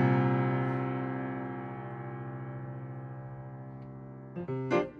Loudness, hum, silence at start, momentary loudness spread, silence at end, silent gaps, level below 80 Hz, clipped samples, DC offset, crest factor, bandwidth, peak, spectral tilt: -35 LUFS; none; 0 s; 16 LU; 0 s; none; -66 dBFS; under 0.1%; under 0.1%; 18 dB; 6.2 kHz; -14 dBFS; -9 dB/octave